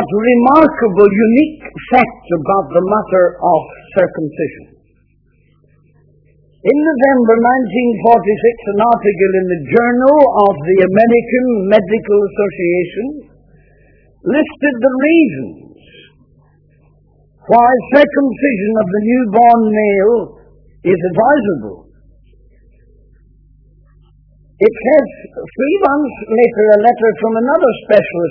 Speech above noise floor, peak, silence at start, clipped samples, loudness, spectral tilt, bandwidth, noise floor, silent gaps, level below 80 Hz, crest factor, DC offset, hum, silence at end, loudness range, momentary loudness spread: 42 dB; 0 dBFS; 0 s; 0.2%; -12 LUFS; -9.5 dB/octave; 5.4 kHz; -53 dBFS; none; -48 dBFS; 12 dB; under 0.1%; 50 Hz at -50 dBFS; 0 s; 7 LU; 10 LU